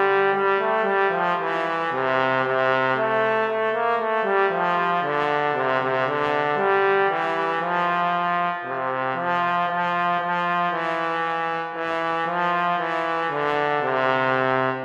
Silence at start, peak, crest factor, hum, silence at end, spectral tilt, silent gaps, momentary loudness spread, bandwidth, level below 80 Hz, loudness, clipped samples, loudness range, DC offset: 0 s; -8 dBFS; 16 dB; none; 0 s; -6 dB/octave; none; 4 LU; 7.8 kHz; -70 dBFS; -22 LUFS; under 0.1%; 2 LU; under 0.1%